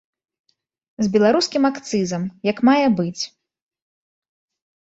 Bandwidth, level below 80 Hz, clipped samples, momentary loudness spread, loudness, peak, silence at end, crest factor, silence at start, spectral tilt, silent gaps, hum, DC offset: 8 kHz; -62 dBFS; under 0.1%; 9 LU; -19 LUFS; -4 dBFS; 1.6 s; 18 dB; 1 s; -5 dB/octave; none; none; under 0.1%